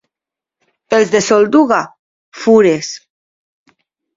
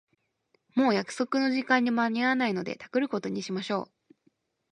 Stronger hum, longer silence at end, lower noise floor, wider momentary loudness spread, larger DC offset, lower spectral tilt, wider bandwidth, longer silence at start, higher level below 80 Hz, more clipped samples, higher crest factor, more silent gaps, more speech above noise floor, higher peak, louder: neither; first, 1.2 s vs 0.9 s; first, -86 dBFS vs -73 dBFS; first, 15 LU vs 8 LU; neither; about the same, -4.5 dB/octave vs -5 dB/octave; second, 7.8 kHz vs 10.5 kHz; first, 0.9 s vs 0.75 s; first, -58 dBFS vs -76 dBFS; neither; about the same, 16 dB vs 20 dB; first, 1.99-2.32 s vs none; first, 75 dB vs 45 dB; first, 0 dBFS vs -8 dBFS; first, -12 LUFS vs -28 LUFS